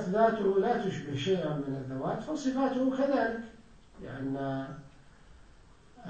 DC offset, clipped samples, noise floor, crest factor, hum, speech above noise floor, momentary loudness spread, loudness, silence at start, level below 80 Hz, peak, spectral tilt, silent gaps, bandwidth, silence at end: under 0.1%; under 0.1%; -57 dBFS; 20 dB; none; 27 dB; 15 LU; -31 LUFS; 0 s; -58 dBFS; -12 dBFS; -6.5 dB/octave; none; 8.8 kHz; 0 s